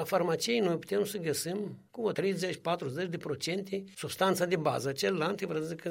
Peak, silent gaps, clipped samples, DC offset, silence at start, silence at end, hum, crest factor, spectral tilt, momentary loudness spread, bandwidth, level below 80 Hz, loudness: -14 dBFS; none; under 0.1%; under 0.1%; 0 s; 0 s; none; 18 dB; -4.5 dB/octave; 7 LU; 16.5 kHz; -74 dBFS; -32 LUFS